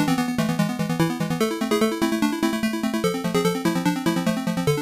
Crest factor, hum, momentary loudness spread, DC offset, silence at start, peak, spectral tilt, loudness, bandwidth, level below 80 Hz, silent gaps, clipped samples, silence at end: 10 dB; none; 2 LU; under 0.1%; 0 s; -12 dBFS; -5.5 dB/octave; -23 LUFS; 15.5 kHz; -52 dBFS; none; under 0.1%; 0 s